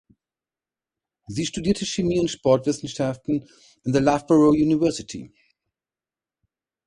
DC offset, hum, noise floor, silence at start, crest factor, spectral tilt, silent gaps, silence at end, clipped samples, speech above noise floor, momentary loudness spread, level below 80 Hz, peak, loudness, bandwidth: under 0.1%; none; under -90 dBFS; 1.3 s; 20 dB; -6 dB/octave; none; 1.6 s; under 0.1%; over 68 dB; 15 LU; -52 dBFS; -4 dBFS; -22 LUFS; 11 kHz